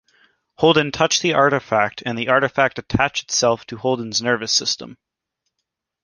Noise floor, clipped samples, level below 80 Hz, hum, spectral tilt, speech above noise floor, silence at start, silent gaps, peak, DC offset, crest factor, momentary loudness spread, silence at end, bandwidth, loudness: -79 dBFS; under 0.1%; -48 dBFS; none; -3 dB/octave; 60 dB; 0.6 s; none; -2 dBFS; under 0.1%; 18 dB; 7 LU; 1.1 s; 10.5 kHz; -19 LUFS